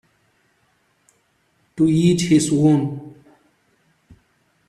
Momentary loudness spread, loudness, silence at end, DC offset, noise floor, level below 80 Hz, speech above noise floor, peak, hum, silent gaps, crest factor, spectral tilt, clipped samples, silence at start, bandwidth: 16 LU; -17 LUFS; 1.6 s; under 0.1%; -64 dBFS; -56 dBFS; 48 dB; -4 dBFS; none; none; 18 dB; -6 dB/octave; under 0.1%; 1.75 s; 13 kHz